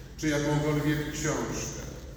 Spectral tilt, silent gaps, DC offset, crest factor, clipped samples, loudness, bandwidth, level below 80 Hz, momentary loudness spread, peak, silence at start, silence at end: -5 dB/octave; none; under 0.1%; 14 dB; under 0.1%; -29 LUFS; over 20 kHz; -44 dBFS; 8 LU; -16 dBFS; 0 s; 0 s